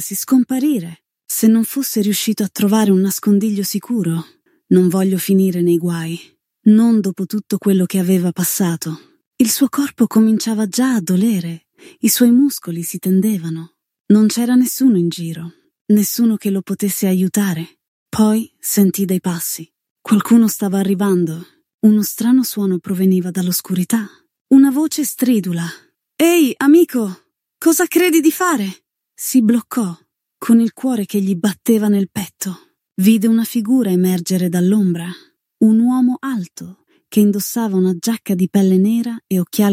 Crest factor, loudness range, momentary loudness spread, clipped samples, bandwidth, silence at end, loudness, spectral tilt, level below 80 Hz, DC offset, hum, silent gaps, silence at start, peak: 14 dB; 2 LU; 12 LU; under 0.1%; 16.5 kHz; 0 s; -16 LUFS; -5.5 dB/octave; -66 dBFS; under 0.1%; none; 9.27-9.31 s, 14.00-14.04 s, 15.81-15.85 s, 17.88-18.06 s, 19.90-19.96 s, 21.74-21.78 s, 24.41-24.45 s; 0 s; 0 dBFS